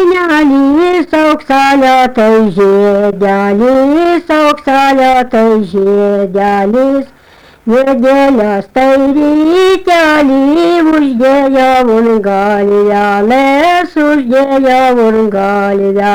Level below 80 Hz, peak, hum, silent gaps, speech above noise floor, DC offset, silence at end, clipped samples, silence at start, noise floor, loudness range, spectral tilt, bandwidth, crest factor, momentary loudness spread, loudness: -40 dBFS; -2 dBFS; none; none; 31 dB; under 0.1%; 0 s; under 0.1%; 0 s; -39 dBFS; 2 LU; -6 dB/octave; 19 kHz; 6 dB; 3 LU; -8 LUFS